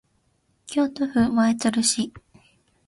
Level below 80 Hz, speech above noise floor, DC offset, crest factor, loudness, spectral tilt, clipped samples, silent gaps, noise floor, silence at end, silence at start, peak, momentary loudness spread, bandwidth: -54 dBFS; 46 dB; under 0.1%; 18 dB; -22 LUFS; -3.5 dB/octave; under 0.1%; none; -67 dBFS; 0.7 s; 0.7 s; -8 dBFS; 8 LU; 11.5 kHz